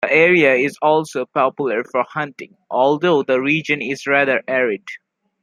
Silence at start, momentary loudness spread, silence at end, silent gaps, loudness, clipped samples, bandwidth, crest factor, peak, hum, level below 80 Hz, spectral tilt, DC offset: 0 s; 13 LU; 0.45 s; none; -17 LUFS; under 0.1%; 12.5 kHz; 16 dB; -2 dBFS; none; -68 dBFS; -5.5 dB/octave; under 0.1%